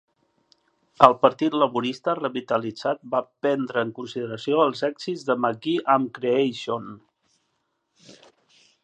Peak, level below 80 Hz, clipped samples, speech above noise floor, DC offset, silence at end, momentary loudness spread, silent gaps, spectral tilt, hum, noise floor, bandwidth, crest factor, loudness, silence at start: 0 dBFS; -70 dBFS; under 0.1%; 51 dB; under 0.1%; 0.7 s; 13 LU; none; -6 dB/octave; none; -74 dBFS; 9.6 kHz; 24 dB; -23 LUFS; 1 s